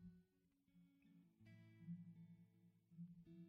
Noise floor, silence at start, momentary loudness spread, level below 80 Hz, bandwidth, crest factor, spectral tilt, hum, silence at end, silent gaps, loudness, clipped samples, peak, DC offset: -83 dBFS; 0 s; 10 LU; -88 dBFS; 5 kHz; 18 dB; -9.5 dB/octave; none; 0 s; none; -62 LUFS; under 0.1%; -46 dBFS; under 0.1%